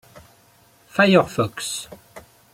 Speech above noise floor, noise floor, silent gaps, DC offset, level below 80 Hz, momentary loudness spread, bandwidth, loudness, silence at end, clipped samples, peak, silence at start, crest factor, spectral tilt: 36 dB; -55 dBFS; none; under 0.1%; -58 dBFS; 15 LU; 16 kHz; -20 LUFS; 0.35 s; under 0.1%; -2 dBFS; 0.15 s; 20 dB; -4.5 dB/octave